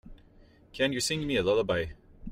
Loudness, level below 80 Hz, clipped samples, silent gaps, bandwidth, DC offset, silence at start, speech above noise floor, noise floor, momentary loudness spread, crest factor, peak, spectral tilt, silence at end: -29 LUFS; -50 dBFS; under 0.1%; none; 16 kHz; under 0.1%; 0.05 s; 29 dB; -57 dBFS; 17 LU; 16 dB; -14 dBFS; -4 dB/octave; 0 s